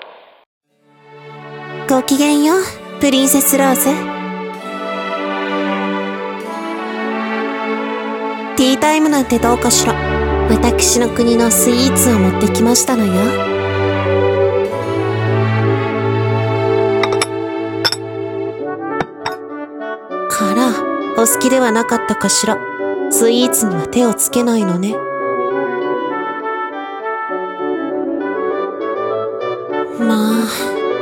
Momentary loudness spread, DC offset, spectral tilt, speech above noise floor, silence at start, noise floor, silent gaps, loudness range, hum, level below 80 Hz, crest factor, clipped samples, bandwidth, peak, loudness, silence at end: 11 LU; under 0.1%; -4 dB/octave; 35 dB; 0 s; -48 dBFS; 0.46-0.61 s; 8 LU; none; -36 dBFS; 16 dB; under 0.1%; 18 kHz; 0 dBFS; -15 LUFS; 0 s